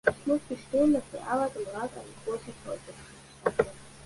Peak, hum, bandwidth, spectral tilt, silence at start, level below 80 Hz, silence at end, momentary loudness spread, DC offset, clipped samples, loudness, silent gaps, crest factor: -8 dBFS; none; 11.5 kHz; -5.5 dB/octave; 0.05 s; -58 dBFS; 0 s; 15 LU; under 0.1%; under 0.1%; -31 LUFS; none; 24 dB